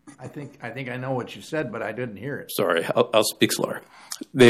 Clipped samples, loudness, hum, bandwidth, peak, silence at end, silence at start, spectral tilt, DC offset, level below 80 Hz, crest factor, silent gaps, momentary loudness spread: under 0.1%; -25 LUFS; none; 15.5 kHz; -4 dBFS; 0 s; 0.05 s; -4.5 dB/octave; under 0.1%; -62 dBFS; 20 dB; none; 16 LU